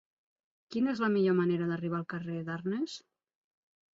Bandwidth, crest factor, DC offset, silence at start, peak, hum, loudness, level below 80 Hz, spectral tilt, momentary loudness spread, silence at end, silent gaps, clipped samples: 7.8 kHz; 16 dB; under 0.1%; 0.7 s; -18 dBFS; none; -32 LUFS; -76 dBFS; -7.5 dB/octave; 11 LU; 0.95 s; none; under 0.1%